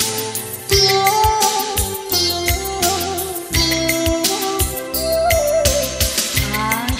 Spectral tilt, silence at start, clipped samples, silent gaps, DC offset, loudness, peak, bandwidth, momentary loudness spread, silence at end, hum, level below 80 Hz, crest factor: -2.5 dB/octave; 0 s; under 0.1%; none; under 0.1%; -17 LUFS; 0 dBFS; 16.5 kHz; 6 LU; 0 s; none; -30 dBFS; 18 dB